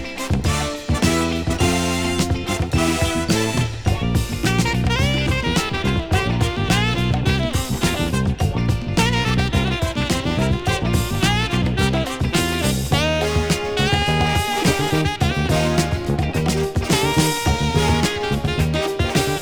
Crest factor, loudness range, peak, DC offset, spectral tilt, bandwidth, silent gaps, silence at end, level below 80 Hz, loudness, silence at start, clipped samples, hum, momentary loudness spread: 16 dB; 1 LU; -2 dBFS; under 0.1%; -5 dB/octave; over 20 kHz; none; 0 s; -28 dBFS; -20 LUFS; 0 s; under 0.1%; none; 4 LU